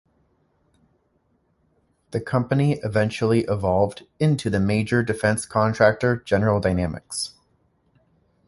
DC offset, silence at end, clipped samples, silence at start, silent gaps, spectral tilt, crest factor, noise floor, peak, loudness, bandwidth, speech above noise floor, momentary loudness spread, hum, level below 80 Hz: under 0.1%; 1.2 s; under 0.1%; 2.1 s; none; -6 dB/octave; 20 dB; -67 dBFS; -2 dBFS; -22 LUFS; 11.5 kHz; 46 dB; 10 LU; none; -46 dBFS